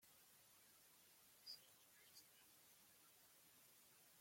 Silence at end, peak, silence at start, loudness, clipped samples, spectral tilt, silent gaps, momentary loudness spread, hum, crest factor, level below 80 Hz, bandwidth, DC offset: 0 s; -46 dBFS; 0 s; -66 LUFS; under 0.1%; 0 dB/octave; none; 9 LU; none; 24 dB; under -90 dBFS; 16.5 kHz; under 0.1%